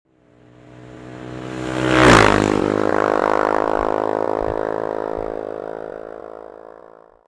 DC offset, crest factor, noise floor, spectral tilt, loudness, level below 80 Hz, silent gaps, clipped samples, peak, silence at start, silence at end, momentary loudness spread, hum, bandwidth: under 0.1%; 18 dB; -51 dBFS; -5 dB/octave; -18 LUFS; -38 dBFS; none; under 0.1%; -2 dBFS; 0.75 s; 0.45 s; 24 LU; none; 11 kHz